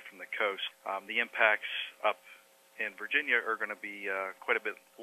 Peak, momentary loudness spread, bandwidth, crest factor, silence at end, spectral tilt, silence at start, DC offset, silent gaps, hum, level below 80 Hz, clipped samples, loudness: -10 dBFS; 11 LU; 14 kHz; 24 dB; 0 s; -2 dB/octave; 0 s; under 0.1%; none; none; under -90 dBFS; under 0.1%; -32 LUFS